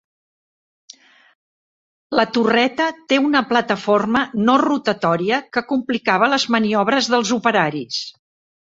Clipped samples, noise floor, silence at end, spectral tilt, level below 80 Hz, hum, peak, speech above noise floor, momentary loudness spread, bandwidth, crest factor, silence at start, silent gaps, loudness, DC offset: under 0.1%; under -90 dBFS; 0.55 s; -4.5 dB/octave; -60 dBFS; none; -2 dBFS; over 72 dB; 6 LU; 7.8 kHz; 18 dB; 2.1 s; none; -18 LUFS; under 0.1%